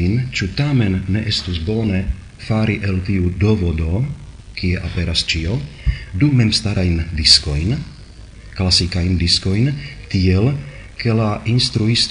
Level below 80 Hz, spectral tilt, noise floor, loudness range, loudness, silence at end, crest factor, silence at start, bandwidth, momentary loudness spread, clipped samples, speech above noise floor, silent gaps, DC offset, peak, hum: -32 dBFS; -5 dB/octave; -37 dBFS; 4 LU; -17 LUFS; 0 s; 18 dB; 0 s; 10.5 kHz; 10 LU; under 0.1%; 20 dB; none; under 0.1%; 0 dBFS; none